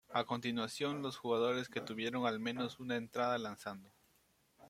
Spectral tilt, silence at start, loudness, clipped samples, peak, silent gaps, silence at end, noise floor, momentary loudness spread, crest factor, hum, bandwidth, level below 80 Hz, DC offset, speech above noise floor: -5 dB/octave; 0.1 s; -39 LUFS; under 0.1%; -20 dBFS; none; 0 s; -74 dBFS; 8 LU; 20 dB; none; 16 kHz; -78 dBFS; under 0.1%; 35 dB